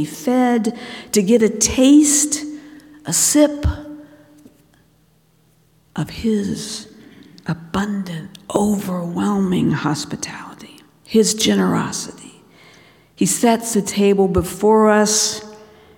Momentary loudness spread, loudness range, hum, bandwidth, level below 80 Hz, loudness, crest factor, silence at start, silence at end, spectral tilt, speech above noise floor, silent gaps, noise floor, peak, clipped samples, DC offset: 18 LU; 11 LU; none; 18 kHz; -40 dBFS; -17 LUFS; 18 dB; 0 s; 0.35 s; -4 dB/octave; 40 dB; none; -57 dBFS; 0 dBFS; under 0.1%; under 0.1%